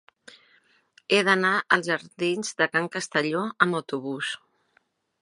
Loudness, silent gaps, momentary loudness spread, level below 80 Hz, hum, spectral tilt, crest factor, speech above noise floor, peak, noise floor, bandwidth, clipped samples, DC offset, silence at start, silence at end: -24 LUFS; none; 11 LU; -78 dBFS; none; -4 dB/octave; 26 dB; 43 dB; -2 dBFS; -68 dBFS; 11.5 kHz; under 0.1%; under 0.1%; 1.1 s; 0.85 s